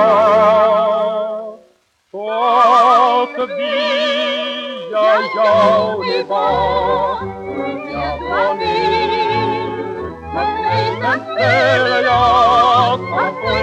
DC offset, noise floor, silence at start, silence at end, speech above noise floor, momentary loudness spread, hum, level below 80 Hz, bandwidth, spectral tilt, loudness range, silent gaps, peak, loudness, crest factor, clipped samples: under 0.1%; -55 dBFS; 0 s; 0 s; 41 dB; 12 LU; none; -44 dBFS; 9.2 kHz; -5.5 dB/octave; 4 LU; none; -2 dBFS; -15 LUFS; 12 dB; under 0.1%